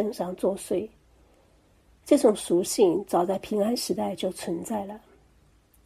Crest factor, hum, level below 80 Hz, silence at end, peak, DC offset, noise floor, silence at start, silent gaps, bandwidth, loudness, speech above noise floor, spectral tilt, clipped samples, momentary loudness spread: 20 dB; none; -62 dBFS; 0.85 s; -6 dBFS; under 0.1%; -60 dBFS; 0 s; none; 15.5 kHz; -26 LUFS; 35 dB; -5 dB/octave; under 0.1%; 12 LU